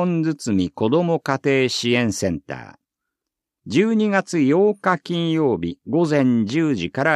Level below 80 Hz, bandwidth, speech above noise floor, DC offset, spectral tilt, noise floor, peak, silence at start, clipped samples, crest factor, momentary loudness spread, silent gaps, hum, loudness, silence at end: -56 dBFS; 13.5 kHz; 65 dB; under 0.1%; -6 dB/octave; -84 dBFS; -4 dBFS; 0 s; under 0.1%; 16 dB; 6 LU; none; none; -20 LUFS; 0 s